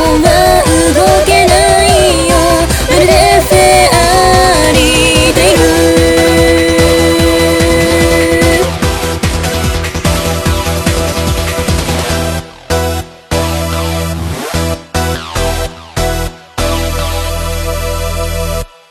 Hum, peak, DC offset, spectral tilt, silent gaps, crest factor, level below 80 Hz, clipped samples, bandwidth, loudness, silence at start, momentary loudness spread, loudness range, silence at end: none; 0 dBFS; under 0.1%; -4 dB/octave; none; 10 dB; -20 dBFS; 0.5%; over 20 kHz; -10 LUFS; 0 s; 10 LU; 9 LU; 0.25 s